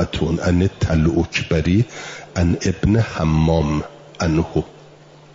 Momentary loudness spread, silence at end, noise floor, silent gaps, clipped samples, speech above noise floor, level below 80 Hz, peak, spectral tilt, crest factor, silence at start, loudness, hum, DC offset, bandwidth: 8 LU; 0.65 s; -45 dBFS; none; under 0.1%; 27 dB; -34 dBFS; -6 dBFS; -6.5 dB/octave; 14 dB; 0 s; -19 LUFS; none; under 0.1%; 7.8 kHz